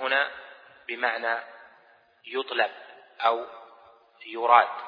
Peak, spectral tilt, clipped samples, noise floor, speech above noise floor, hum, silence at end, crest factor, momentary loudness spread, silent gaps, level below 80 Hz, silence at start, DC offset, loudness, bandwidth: -4 dBFS; -3.5 dB/octave; under 0.1%; -59 dBFS; 34 dB; none; 0 s; 26 dB; 26 LU; none; -84 dBFS; 0 s; under 0.1%; -26 LUFS; 5.2 kHz